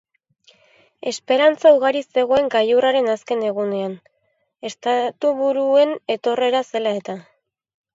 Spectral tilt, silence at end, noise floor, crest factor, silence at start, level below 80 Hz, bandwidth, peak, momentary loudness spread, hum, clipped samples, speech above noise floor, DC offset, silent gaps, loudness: -4 dB/octave; 0.75 s; -69 dBFS; 18 dB; 1.05 s; -64 dBFS; 7.8 kHz; -2 dBFS; 15 LU; none; under 0.1%; 50 dB; under 0.1%; none; -19 LUFS